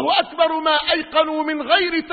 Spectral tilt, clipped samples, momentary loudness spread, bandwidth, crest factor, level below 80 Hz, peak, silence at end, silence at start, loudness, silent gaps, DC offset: -7.5 dB/octave; under 0.1%; 3 LU; 4.8 kHz; 16 dB; -54 dBFS; -2 dBFS; 0 s; 0 s; -18 LUFS; none; under 0.1%